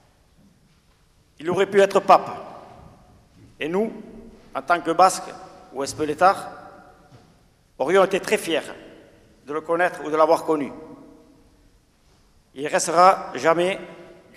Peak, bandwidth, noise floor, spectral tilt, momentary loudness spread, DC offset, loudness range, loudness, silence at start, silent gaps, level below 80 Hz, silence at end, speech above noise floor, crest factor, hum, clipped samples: 0 dBFS; 15.5 kHz; -59 dBFS; -4 dB/octave; 22 LU; under 0.1%; 3 LU; -21 LUFS; 1.4 s; none; -60 dBFS; 0.35 s; 38 dB; 22 dB; none; under 0.1%